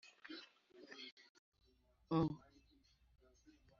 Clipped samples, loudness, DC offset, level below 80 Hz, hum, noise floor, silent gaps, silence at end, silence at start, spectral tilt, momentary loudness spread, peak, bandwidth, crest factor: under 0.1%; -45 LUFS; under 0.1%; -72 dBFS; none; -75 dBFS; 1.12-1.17 s, 1.29-1.52 s; 1.4 s; 0.05 s; -6 dB/octave; 21 LU; -28 dBFS; 7.2 kHz; 20 dB